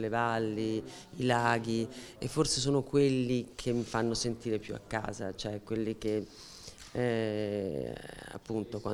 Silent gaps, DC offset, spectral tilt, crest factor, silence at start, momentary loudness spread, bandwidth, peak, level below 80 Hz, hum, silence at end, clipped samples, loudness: none; under 0.1%; -5 dB/octave; 20 dB; 0 s; 13 LU; 15.5 kHz; -12 dBFS; -56 dBFS; none; 0 s; under 0.1%; -33 LUFS